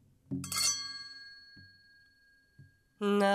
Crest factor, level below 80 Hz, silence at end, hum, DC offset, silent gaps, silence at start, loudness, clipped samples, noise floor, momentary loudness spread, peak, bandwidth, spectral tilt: 20 dB; -76 dBFS; 0 s; none; under 0.1%; none; 0.3 s; -33 LUFS; under 0.1%; -67 dBFS; 23 LU; -16 dBFS; 16 kHz; -3 dB/octave